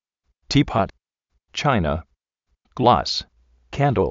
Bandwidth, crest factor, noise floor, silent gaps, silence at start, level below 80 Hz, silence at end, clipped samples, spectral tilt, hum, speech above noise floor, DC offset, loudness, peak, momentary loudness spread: 7.8 kHz; 22 dB; -73 dBFS; none; 0.5 s; -40 dBFS; 0 s; under 0.1%; -4.5 dB/octave; none; 54 dB; under 0.1%; -21 LUFS; -2 dBFS; 13 LU